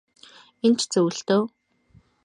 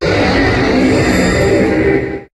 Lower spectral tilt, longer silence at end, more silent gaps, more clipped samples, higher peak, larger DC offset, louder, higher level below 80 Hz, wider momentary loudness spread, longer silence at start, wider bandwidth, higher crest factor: second, -4.5 dB/octave vs -6 dB/octave; first, 0.8 s vs 0.1 s; neither; neither; second, -10 dBFS vs 0 dBFS; neither; second, -23 LUFS vs -12 LUFS; second, -70 dBFS vs -26 dBFS; about the same, 3 LU vs 2 LU; first, 0.65 s vs 0 s; about the same, 11.5 kHz vs 12.5 kHz; about the same, 16 dB vs 12 dB